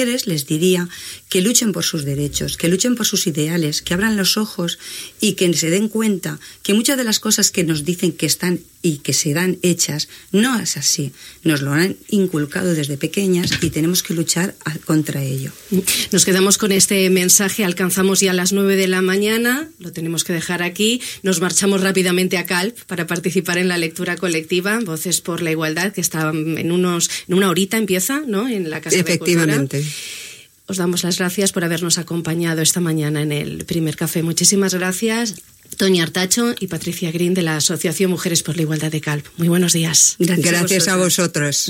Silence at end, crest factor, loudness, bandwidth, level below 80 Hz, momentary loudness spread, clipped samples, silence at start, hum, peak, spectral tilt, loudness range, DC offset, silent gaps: 0 s; 18 dB; -17 LUFS; 17 kHz; -52 dBFS; 9 LU; under 0.1%; 0 s; none; 0 dBFS; -3.5 dB/octave; 4 LU; under 0.1%; none